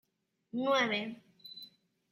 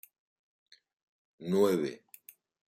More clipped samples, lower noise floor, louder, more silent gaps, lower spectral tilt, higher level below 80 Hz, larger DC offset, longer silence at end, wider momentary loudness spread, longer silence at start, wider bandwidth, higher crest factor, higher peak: neither; first, -80 dBFS vs -57 dBFS; second, -33 LUFS vs -30 LUFS; neither; second, -4 dB/octave vs -6.5 dB/octave; second, -84 dBFS vs -78 dBFS; neither; second, 0.45 s vs 0.8 s; second, 21 LU vs 26 LU; second, 0.55 s vs 1.4 s; about the same, 15 kHz vs 16 kHz; about the same, 20 dB vs 20 dB; about the same, -16 dBFS vs -14 dBFS